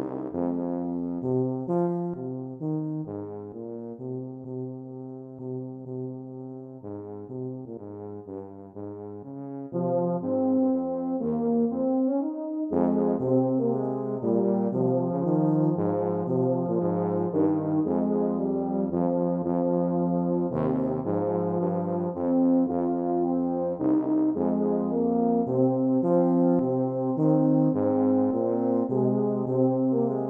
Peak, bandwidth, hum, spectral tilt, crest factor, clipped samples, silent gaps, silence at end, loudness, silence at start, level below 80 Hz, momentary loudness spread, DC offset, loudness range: -10 dBFS; 2.4 kHz; none; -13 dB/octave; 16 dB; under 0.1%; none; 0 s; -26 LUFS; 0 s; -64 dBFS; 15 LU; under 0.1%; 13 LU